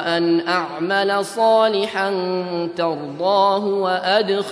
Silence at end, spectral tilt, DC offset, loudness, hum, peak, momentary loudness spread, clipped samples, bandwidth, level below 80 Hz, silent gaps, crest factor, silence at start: 0 s; -5 dB/octave; under 0.1%; -19 LUFS; none; -4 dBFS; 7 LU; under 0.1%; 11 kHz; -72 dBFS; none; 14 dB; 0 s